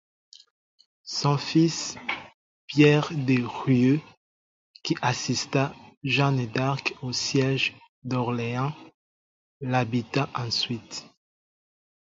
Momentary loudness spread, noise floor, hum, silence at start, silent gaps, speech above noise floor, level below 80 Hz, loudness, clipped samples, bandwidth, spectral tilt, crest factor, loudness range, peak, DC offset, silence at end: 13 LU; under -90 dBFS; none; 1.05 s; 2.34-2.68 s, 4.17-4.74 s, 5.97-6.01 s, 7.89-8.02 s, 8.94-9.60 s; over 65 dB; -62 dBFS; -25 LUFS; under 0.1%; 7.8 kHz; -5 dB/octave; 22 dB; 5 LU; -4 dBFS; under 0.1%; 1.05 s